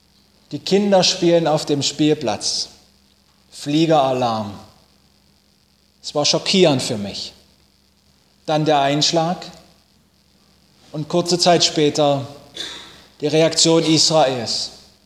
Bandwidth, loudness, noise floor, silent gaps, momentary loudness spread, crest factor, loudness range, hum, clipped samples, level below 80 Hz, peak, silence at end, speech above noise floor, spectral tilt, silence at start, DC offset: 15 kHz; -17 LUFS; -58 dBFS; none; 17 LU; 18 dB; 5 LU; none; under 0.1%; -58 dBFS; 0 dBFS; 0.3 s; 40 dB; -4 dB/octave; 0.5 s; under 0.1%